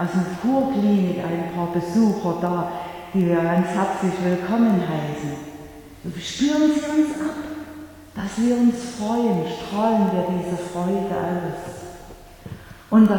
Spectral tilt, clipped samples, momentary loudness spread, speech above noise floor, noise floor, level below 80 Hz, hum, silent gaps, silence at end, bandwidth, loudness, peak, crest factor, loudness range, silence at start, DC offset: -6.5 dB/octave; under 0.1%; 18 LU; 21 dB; -42 dBFS; -52 dBFS; none; none; 0 s; 18.5 kHz; -22 LUFS; -4 dBFS; 18 dB; 3 LU; 0 s; under 0.1%